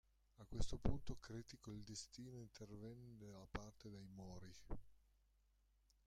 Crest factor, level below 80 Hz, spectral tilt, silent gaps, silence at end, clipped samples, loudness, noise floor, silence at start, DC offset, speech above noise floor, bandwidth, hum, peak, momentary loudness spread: 26 dB; -56 dBFS; -5.5 dB/octave; none; 1.1 s; under 0.1%; -54 LUFS; -79 dBFS; 0.4 s; under 0.1%; 30 dB; 10.5 kHz; 50 Hz at -70 dBFS; -24 dBFS; 12 LU